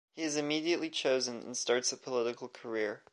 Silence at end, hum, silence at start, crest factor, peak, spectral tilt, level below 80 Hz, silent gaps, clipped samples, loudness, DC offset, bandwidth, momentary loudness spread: 0.15 s; none; 0.15 s; 18 dB; -16 dBFS; -2.5 dB/octave; -86 dBFS; none; under 0.1%; -33 LUFS; under 0.1%; 11.5 kHz; 6 LU